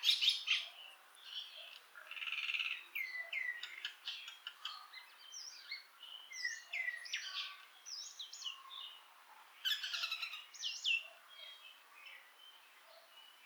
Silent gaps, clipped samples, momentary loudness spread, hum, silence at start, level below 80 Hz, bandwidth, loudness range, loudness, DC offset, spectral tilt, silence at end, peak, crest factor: none; under 0.1%; 21 LU; none; 0 s; under -90 dBFS; over 20 kHz; 4 LU; -41 LUFS; under 0.1%; 5.5 dB/octave; 0 s; -18 dBFS; 26 dB